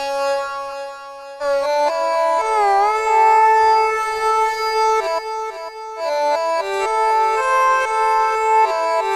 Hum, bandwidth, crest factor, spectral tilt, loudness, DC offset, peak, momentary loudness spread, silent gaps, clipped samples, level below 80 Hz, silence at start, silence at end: none; 13 kHz; 12 dB; -1 dB/octave; -17 LUFS; under 0.1%; -4 dBFS; 13 LU; none; under 0.1%; -54 dBFS; 0 s; 0 s